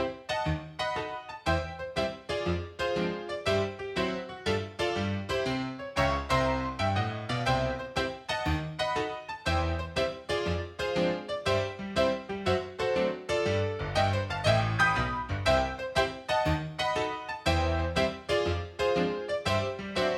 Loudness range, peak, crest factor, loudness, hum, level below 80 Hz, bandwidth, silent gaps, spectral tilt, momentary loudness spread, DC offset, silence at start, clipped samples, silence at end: 4 LU; -10 dBFS; 20 dB; -30 LUFS; none; -44 dBFS; 14 kHz; none; -5.5 dB/octave; 6 LU; under 0.1%; 0 s; under 0.1%; 0 s